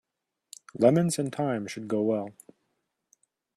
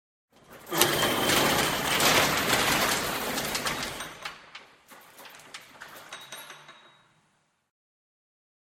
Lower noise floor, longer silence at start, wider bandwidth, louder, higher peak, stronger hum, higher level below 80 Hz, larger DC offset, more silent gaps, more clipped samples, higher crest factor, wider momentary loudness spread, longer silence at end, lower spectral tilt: first, -79 dBFS vs -71 dBFS; first, 0.75 s vs 0.5 s; second, 14.5 kHz vs 16.5 kHz; second, -27 LUFS vs -24 LUFS; about the same, -6 dBFS vs -4 dBFS; neither; second, -70 dBFS vs -54 dBFS; neither; neither; neither; about the same, 22 dB vs 26 dB; second, 20 LU vs 23 LU; second, 1.25 s vs 2 s; first, -6 dB/octave vs -2 dB/octave